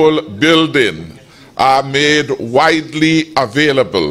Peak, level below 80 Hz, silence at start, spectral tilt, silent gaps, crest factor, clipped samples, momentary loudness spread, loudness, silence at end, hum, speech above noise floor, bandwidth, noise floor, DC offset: 0 dBFS; -48 dBFS; 0 s; -4.5 dB/octave; none; 12 dB; under 0.1%; 5 LU; -12 LUFS; 0 s; none; 25 dB; 13.5 kHz; -37 dBFS; under 0.1%